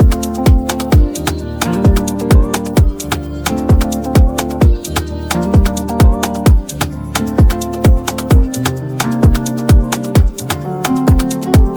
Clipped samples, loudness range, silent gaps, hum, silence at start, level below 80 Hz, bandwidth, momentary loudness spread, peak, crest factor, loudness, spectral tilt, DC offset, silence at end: under 0.1%; 1 LU; none; none; 0 s; -16 dBFS; over 20 kHz; 6 LU; 0 dBFS; 12 dB; -14 LUFS; -6 dB/octave; under 0.1%; 0 s